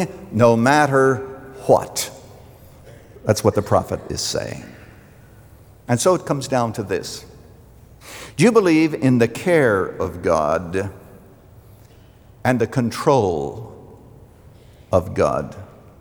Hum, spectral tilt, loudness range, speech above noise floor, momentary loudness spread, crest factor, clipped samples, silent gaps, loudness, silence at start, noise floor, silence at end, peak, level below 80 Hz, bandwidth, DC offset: none; -5.5 dB/octave; 6 LU; 29 dB; 18 LU; 20 dB; under 0.1%; none; -19 LUFS; 0 s; -47 dBFS; 0.35 s; -2 dBFS; -50 dBFS; over 20 kHz; under 0.1%